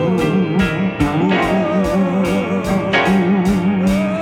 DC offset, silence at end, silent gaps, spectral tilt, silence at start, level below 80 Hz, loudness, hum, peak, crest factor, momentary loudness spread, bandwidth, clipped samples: under 0.1%; 0 s; none; -7 dB/octave; 0 s; -36 dBFS; -16 LUFS; none; -2 dBFS; 14 dB; 3 LU; 13.5 kHz; under 0.1%